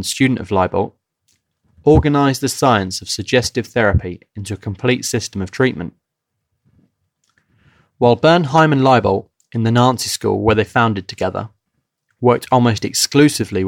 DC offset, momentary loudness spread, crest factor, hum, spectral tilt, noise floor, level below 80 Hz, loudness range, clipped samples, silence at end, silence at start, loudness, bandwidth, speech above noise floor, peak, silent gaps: under 0.1%; 13 LU; 16 dB; none; -5 dB/octave; -76 dBFS; -36 dBFS; 8 LU; under 0.1%; 0 s; 0 s; -16 LUFS; 17 kHz; 61 dB; -2 dBFS; none